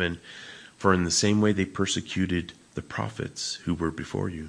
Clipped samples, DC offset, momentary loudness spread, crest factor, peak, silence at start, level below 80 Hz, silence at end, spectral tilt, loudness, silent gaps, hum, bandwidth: under 0.1%; under 0.1%; 17 LU; 22 dB; -6 dBFS; 0 s; -52 dBFS; 0 s; -4.5 dB/octave; -27 LUFS; none; none; 10.5 kHz